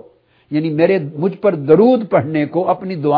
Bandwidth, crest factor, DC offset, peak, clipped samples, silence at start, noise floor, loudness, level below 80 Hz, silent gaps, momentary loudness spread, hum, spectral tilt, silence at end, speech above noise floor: 5.2 kHz; 16 dB; under 0.1%; 0 dBFS; under 0.1%; 0.5 s; -49 dBFS; -15 LUFS; -62 dBFS; none; 9 LU; none; -11 dB/octave; 0 s; 35 dB